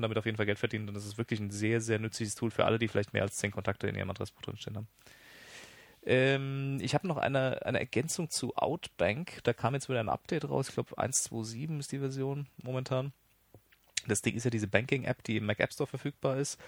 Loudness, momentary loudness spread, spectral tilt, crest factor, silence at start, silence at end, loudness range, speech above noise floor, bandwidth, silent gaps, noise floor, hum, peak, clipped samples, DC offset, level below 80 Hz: -33 LUFS; 11 LU; -4.5 dB/octave; 26 dB; 0 s; 0 s; 4 LU; 30 dB; over 20 kHz; none; -63 dBFS; none; -8 dBFS; under 0.1%; under 0.1%; -66 dBFS